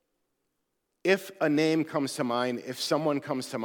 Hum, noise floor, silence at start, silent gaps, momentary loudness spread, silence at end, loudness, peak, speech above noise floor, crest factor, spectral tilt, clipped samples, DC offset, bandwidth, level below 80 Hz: none; -80 dBFS; 1.05 s; none; 7 LU; 0 s; -28 LUFS; -10 dBFS; 52 dB; 20 dB; -5 dB/octave; under 0.1%; under 0.1%; 18.5 kHz; -84 dBFS